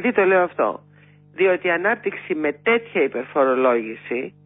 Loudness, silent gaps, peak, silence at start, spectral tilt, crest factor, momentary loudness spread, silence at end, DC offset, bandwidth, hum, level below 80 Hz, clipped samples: -20 LUFS; none; -6 dBFS; 0 s; -10 dB/octave; 16 dB; 10 LU; 0.15 s; under 0.1%; 3.9 kHz; 50 Hz at -50 dBFS; -70 dBFS; under 0.1%